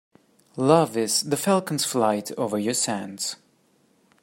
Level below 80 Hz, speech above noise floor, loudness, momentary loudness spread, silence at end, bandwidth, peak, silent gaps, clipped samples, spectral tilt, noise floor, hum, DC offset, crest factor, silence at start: -68 dBFS; 40 dB; -23 LUFS; 11 LU; 0.9 s; 16.5 kHz; -4 dBFS; none; under 0.1%; -4 dB/octave; -63 dBFS; none; under 0.1%; 20 dB; 0.55 s